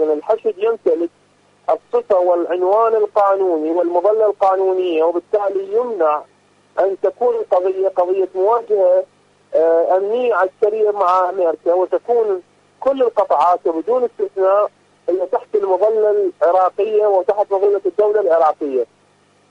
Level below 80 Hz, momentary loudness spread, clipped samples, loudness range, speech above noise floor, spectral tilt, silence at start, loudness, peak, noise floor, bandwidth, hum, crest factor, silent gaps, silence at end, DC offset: -68 dBFS; 7 LU; under 0.1%; 2 LU; 39 dB; -6 dB/octave; 0 s; -17 LUFS; -4 dBFS; -55 dBFS; 7.4 kHz; 50 Hz at -60 dBFS; 12 dB; none; 0.65 s; under 0.1%